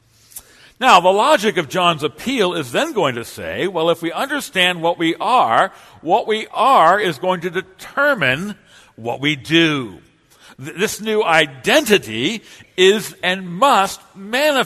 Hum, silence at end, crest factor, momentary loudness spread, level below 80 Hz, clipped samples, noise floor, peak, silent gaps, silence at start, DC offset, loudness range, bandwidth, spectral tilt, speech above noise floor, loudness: none; 0 s; 18 dB; 14 LU; -58 dBFS; under 0.1%; -48 dBFS; 0 dBFS; none; 0.35 s; under 0.1%; 3 LU; 13.5 kHz; -3.5 dB/octave; 31 dB; -16 LUFS